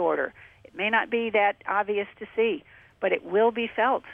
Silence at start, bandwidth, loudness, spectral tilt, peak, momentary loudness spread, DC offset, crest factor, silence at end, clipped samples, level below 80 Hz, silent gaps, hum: 0 s; 3.8 kHz; -26 LUFS; -6.5 dB/octave; -10 dBFS; 9 LU; under 0.1%; 16 dB; 0 s; under 0.1%; -68 dBFS; none; none